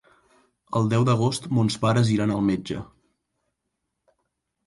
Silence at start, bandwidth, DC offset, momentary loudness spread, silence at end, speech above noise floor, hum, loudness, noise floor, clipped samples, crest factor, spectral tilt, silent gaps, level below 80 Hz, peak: 0.7 s; 11.5 kHz; under 0.1%; 8 LU; 1.85 s; 58 dB; none; -23 LUFS; -80 dBFS; under 0.1%; 16 dB; -6.5 dB/octave; none; -56 dBFS; -8 dBFS